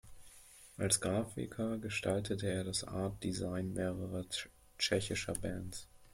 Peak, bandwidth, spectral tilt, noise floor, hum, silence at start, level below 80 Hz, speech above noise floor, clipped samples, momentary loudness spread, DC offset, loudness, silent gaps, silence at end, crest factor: -14 dBFS; 16.5 kHz; -4 dB/octave; -59 dBFS; none; 0.05 s; -58 dBFS; 21 dB; under 0.1%; 15 LU; under 0.1%; -37 LUFS; none; 0.05 s; 24 dB